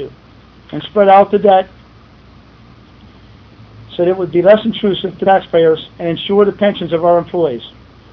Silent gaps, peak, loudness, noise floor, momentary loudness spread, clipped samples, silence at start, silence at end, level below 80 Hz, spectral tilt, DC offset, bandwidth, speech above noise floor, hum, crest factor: none; 0 dBFS; -13 LUFS; -42 dBFS; 18 LU; under 0.1%; 0 s; 0.45 s; -48 dBFS; -8.5 dB/octave; under 0.1%; 5.4 kHz; 30 dB; none; 14 dB